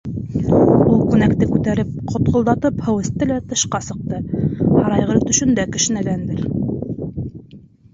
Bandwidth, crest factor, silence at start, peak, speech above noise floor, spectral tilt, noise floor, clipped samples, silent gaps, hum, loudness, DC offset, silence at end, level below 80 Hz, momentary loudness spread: 7.8 kHz; 16 dB; 0.05 s; -2 dBFS; 25 dB; -5.5 dB/octave; -43 dBFS; under 0.1%; none; none; -18 LUFS; under 0.1%; 0.35 s; -38 dBFS; 12 LU